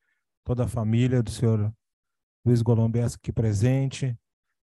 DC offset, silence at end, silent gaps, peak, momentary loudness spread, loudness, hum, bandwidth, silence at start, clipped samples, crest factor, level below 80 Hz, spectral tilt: under 0.1%; 0.65 s; 1.93-2.03 s, 2.23-2.43 s; -8 dBFS; 9 LU; -25 LUFS; none; 12 kHz; 0.45 s; under 0.1%; 16 dB; -48 dBFS; -7.5 dB/octave